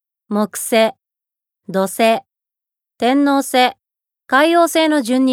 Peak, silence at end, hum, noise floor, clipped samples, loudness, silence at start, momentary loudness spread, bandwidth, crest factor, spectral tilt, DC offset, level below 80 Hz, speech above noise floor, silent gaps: -2 dBFS; 0 s; none; -84 dBFS; under 0.1%; -16 LUFS; 0.3 s; 8 LU; 17.5 kHz; 16 dB; -3.5 dB/octave; under 0.1%; -72 dBFS; 70 dB; none